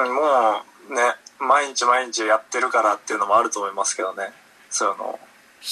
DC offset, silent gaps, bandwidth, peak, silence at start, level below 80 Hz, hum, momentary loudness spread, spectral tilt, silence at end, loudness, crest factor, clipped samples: under 0.1%; none; 13 kHz; -4 dBFS; 0 s; -76 dBFS; none; 12 LU; -0.5 dB/octave; 0 s; -21 LUFS; 18 dB; under 0.1%